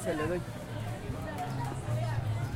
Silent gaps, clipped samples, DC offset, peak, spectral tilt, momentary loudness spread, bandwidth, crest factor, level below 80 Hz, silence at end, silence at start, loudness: none; under 0.1%; under 0.1%; -22 dBFS; -6.5 dB/octave; 6 LU; 16 kHz; 12 dB; -48 dBFS; 0 s; 0 s; -35 LUFS